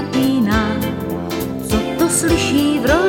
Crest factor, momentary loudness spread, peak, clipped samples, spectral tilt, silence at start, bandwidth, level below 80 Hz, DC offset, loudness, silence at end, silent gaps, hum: 16 dB; 8 LU; 0 dBFS; under 0.1%; -4.5 dB/octave; 0 s; 17 kHz; -32 dBFS; under 0.1%; -17 LUFS; 0 s; none; none